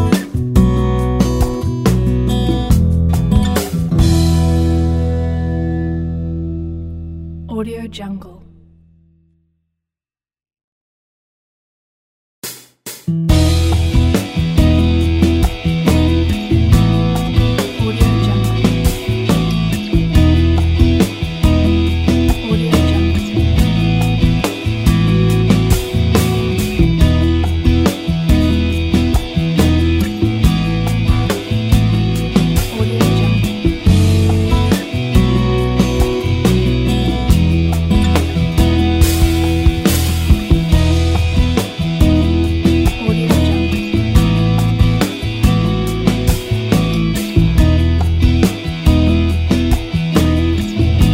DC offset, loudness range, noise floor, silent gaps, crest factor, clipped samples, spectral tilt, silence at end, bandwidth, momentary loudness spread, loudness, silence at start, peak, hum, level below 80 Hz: under 0.1%; 4 LU; under -90 dBFS; 10.64-12.42 s; 14 dB; under 0.1%; -6.5 dB/octave; 0 s; 16.5 kHz; 5 LU; -14 LUFS; 0 s; 0 dBFS; none; -20 dBFS